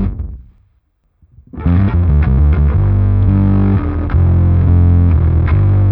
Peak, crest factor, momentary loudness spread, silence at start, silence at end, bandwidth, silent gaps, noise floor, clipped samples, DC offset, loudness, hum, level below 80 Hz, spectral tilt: 0 dBFS; 10 dB; 6 LU; 0 s; 0 s; 3.5 kHz; none; -59 dBFS; under 0.1%; under 0.1%; -12 LUFS; none; -18 dBFS; -13 dB/octave